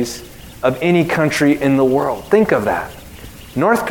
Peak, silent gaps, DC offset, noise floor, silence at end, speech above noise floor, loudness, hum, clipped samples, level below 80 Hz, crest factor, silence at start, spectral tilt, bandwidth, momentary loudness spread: 0 dBFS; none; 0.2%; -35 dBFS; 0 s; 20 dB; -16 LUFS; none; under 0.1%; -44 dBFS; 16 dB; 0 s; -6 dB/octave; 18 kHz; 19 LU